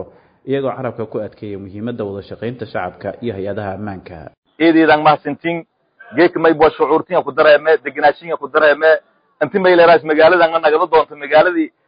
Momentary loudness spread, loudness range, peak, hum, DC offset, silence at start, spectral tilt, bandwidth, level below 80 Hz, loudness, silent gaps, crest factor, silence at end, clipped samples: 16 LU; 12 LU; -2 dBFS; none; under 0.1%; 0 s; -11 dB/octave; 5.2 kHz; -50 dBFS; -14 LUFS; 4.37-4.42 s; 14 dB; 0.2 s; under 0.1%